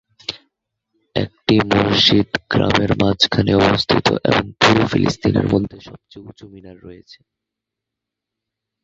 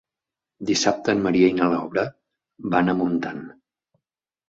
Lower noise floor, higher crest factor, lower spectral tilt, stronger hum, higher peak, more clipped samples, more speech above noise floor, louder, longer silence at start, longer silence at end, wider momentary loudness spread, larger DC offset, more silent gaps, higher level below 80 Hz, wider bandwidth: second, -83 dBFS vs -88 dBFS; about the same, 18 dB vs 20 dB; about the same, -5.5 dB/octave vs -5 dB/octave; neither; first, 0 dBFS vs -4 dBFS; neither; about the same, 66 dB vs 67 dB; first, -16 LUFS vs -22 LUFS; second, 0.3 s vs 0.6 s; first, 1.9 s vs 1 s; second, 11 LU vs 14 LU; neither; neither; first, -42 dBFS vs -58 dBFS; about the same, 7.8 kHz vs 7.8 kHz